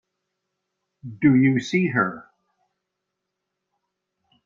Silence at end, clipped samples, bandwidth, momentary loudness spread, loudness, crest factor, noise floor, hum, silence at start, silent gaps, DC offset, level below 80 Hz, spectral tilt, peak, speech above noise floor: 2.25 s; under 0.1%; 7.4 kHz; 9 LU; -20 LUFS; 20 dB; -81 dBFS; none; 1.05 s; none; under 0.1%; -62 dBFS; -7 dB/octave; -6 dBFS; 61 dB